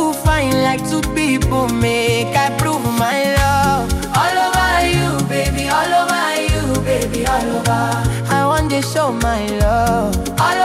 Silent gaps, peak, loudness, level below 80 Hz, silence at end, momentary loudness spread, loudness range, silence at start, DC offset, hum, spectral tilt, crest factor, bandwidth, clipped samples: none; -2 dBFS; -16 LUFS; -26 dBFS; 0 s; 3 LU; 1 LU; 0 s; under 0.1%; none; -4.5 dB/octave; 14 dB; 16.5 kHz; under 0.1%